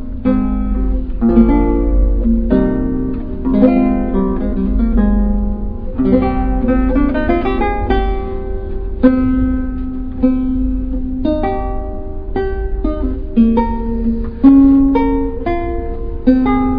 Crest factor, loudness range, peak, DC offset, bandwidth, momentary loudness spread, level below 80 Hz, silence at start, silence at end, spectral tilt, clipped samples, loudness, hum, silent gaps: 14 dB; 5 LU; 0 dBFS; under 0.1%; 4.9 kHz; 11 LU; -20 dBFS; 0 s; 0 s; -11.5 dB/octave; under 0.1%; -16 LUFS; none; none